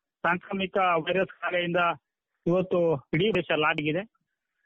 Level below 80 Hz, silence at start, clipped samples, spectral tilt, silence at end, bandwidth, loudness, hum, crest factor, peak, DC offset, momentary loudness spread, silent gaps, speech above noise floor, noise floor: -64 dBFS; 0.25 s; under 0.1%; -3.5 dB/octave; 0.6 s; 7 kHz; -26 LUFS; none; 16 dB; -12 dBFS; under 0.1%; 6 LU; none; 52 dB; -78 dBFS